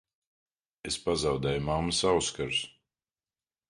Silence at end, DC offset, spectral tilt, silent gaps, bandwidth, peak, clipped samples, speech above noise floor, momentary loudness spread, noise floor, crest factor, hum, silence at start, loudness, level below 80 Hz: 1 s; under 0.1%; -3.5 dB/octave; none; 11.5 kHz; -12 dBFS; under 0.1%; over 61 dB; 9 LU; under -90 dBFS; 20 dB; none; 0.85 s; -29 LUFS; -50 dBFS